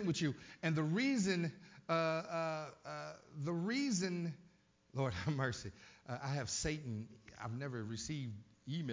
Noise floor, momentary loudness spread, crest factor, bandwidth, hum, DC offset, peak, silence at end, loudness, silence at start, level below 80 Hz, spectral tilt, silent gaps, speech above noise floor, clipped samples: -68 dBFS; 13 LU; 16 dB; 7.8 kHz; none; under 0.1%; -24 dBFS; 0 s; -40 LUFS; 0 s; -64 dBFS; -5 dB/octave; none; 28 dB; under 0.1%